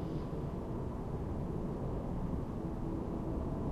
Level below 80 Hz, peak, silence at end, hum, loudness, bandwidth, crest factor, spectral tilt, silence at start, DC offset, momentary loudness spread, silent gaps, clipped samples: -44 dBFS; -26 dBFS; 0 s; none; -40 LUFS; 13 kHz; 12 dB; -9.5 dB/octave; 0 s; under 0.1%; 2 LU; none; under 0.1%